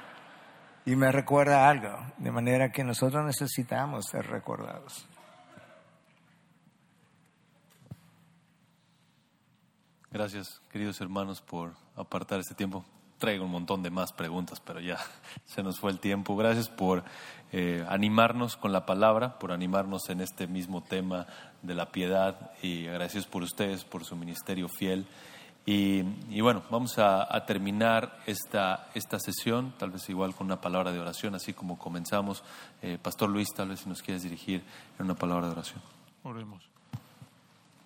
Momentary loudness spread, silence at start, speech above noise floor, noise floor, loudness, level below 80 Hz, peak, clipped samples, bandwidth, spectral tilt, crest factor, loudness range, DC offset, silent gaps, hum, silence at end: 18 LU; 0 s; 37 dB; -68 dBFS; -31 LUFS; -70 dBFS; -6 dBFS; under 0.1%; 17.5 kHz; -5.5 dB/octave; 24 dB; 10 LU; under 0.1%; none; none; 0.6 s